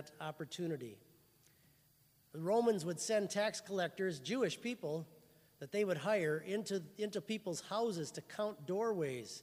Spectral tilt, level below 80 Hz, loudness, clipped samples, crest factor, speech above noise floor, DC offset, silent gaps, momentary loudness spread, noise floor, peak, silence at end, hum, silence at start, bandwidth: -4.5 dB/octave; -84 dBFS; -39 LUFS; under 0.1%; 18 dB; 32 dB; under 0.1%; none; 10 LU; -71 dBFS; -22 dBFS; 0 s; none; 0 s; 15.5 kHz